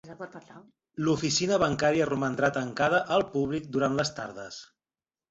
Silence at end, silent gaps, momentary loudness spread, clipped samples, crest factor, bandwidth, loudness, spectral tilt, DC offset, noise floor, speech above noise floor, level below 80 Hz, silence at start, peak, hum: 0.65 s; none; 18 LU; under 0.1%; 18 dB; 8 kHz; -27 LUFS; -4.5 dB/octave; under 0.1%; under -90 dBFS; over 62 dB; -60 dBFS; 0.05 s; -10 dBFS; none